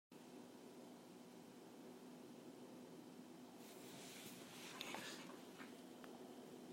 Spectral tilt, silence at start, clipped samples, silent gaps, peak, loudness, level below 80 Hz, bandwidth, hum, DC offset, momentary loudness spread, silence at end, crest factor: -3.5 dB/octave; 0.1 s; under 0.1%; none; -30 dBFS; -57 LUFS; under -90 dBFS; 16 kHz; none; under 0.1%; 9 LU; 0 s; 28 dB